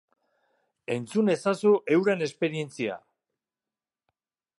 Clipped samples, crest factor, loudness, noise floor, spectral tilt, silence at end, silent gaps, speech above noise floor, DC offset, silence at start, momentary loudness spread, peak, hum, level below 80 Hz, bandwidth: under 0.1%; 18 dB; -26 LUFS; under -90 dBFS; -6 dB/octave; 1.6 s; none; over 65 dB; under 0.1%; 0.9 s; 11 LU; -10 dBFS; none; -78 dBFS; 11.5 kHz